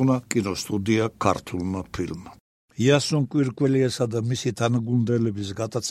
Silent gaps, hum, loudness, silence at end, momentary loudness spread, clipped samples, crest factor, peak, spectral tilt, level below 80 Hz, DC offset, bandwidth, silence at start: 2.40-2.68 s; none; -24 LUFS; 0 s; 9 LU; under 0.1%; 20 dB; -4 dBFS; -6 dB/octave; -54 dBFS; under 0.1%; 14 kHz; 0 s